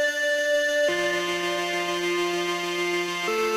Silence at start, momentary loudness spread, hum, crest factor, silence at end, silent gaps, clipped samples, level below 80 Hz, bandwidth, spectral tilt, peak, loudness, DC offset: 0 s; 3 LU; none; 10 dB; 0 s; none; under 0.1%; -66 dBFS; 16 kHz; -2.5 dB/octave; -16 dBFS; -24 LUFS; under 0.1%